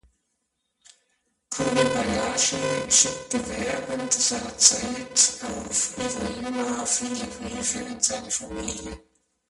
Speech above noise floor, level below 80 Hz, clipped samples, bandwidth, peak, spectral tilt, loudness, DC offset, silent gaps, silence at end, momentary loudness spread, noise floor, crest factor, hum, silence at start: 51 dB; -50 dBFS; under 0.1%; 11.5 kHz; -2 dBFS; -1.5 dB/octave; -23 LUFS; under 0.1%; none; 0.5 s; 14 LU; -77 dBFS; 24 dB; none; 1.5 s